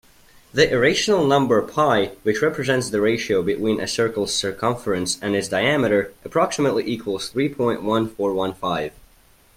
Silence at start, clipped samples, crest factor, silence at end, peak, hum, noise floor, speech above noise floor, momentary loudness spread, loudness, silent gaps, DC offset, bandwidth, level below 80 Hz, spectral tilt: 0.55 s; under 0.1%; 20 dB; 0.65 s; -2 dBFS; none; -54 dBFS; 33 dB; 7 LU; -21 LUFS; none; under 0.1%; 16 kHz; -52 dBFS; -4.5 dB/octave